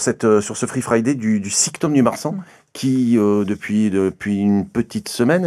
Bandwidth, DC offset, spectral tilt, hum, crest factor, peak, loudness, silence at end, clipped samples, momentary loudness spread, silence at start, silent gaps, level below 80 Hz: 13.5 kHz; under 0.1%; -5 dB/octave; none; 16 dB; -2 dBFS; -18 LUFS; 0 s; under 0.1%; 8 LU; 0 s; none; -56 dBFS